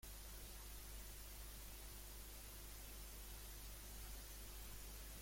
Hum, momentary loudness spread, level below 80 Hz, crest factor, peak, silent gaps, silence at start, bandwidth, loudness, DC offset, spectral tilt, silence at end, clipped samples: 50 Hz at -55 dBFS; 1 LU; -56 dBFS; 12 dB; -42 dBFS; none; 0 s; 16.5 kHz; -55 LUFS; under 0.1%; -2.5 dB/octave; 0 s; under 0.1%